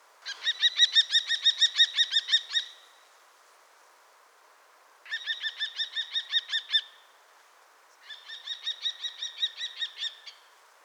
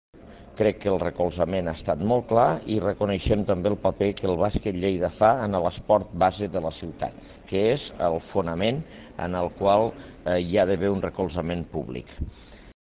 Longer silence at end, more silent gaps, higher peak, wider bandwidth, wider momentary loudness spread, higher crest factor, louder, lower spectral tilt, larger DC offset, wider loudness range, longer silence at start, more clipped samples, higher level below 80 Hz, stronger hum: first, 0.55 s vs 0.1 s; neither; second, -10 dBFS vs -6 dBFS; first, 17.5 kHz vs 4 kHz; first, 19 LU vs 12 LU; about the same, 22 dB vs 18 dB; about the same, -26 LUFS vs -25 LUFS; second, 8 dB/octave vs -11 dB/octave; neither; first, 12 LU vs 2 LU; about the same, 0.25 s vs 0.25 s; neither; second, under -90 dBFS vs -42 dBFS; neither